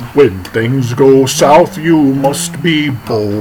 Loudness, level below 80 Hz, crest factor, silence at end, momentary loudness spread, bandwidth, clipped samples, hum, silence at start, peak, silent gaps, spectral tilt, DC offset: -11 LUFS; -44 dBFS; 10 dB; 0 s; 8 LU; 19 kHz; 0.5%; none; 0 s; 0 dBFS; none; -5.5 dB/octave; under 0.1%